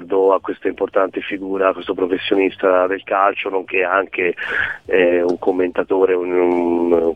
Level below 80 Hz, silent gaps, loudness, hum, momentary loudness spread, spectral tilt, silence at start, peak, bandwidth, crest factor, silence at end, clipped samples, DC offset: -54 dBFS; none; -18 LUFS; none; 5 LU; -6.5 dB/octave; 0 s; -2 dBFS; 6 kHz; 16 dB; 0 s; under 0.1%; under 0.1%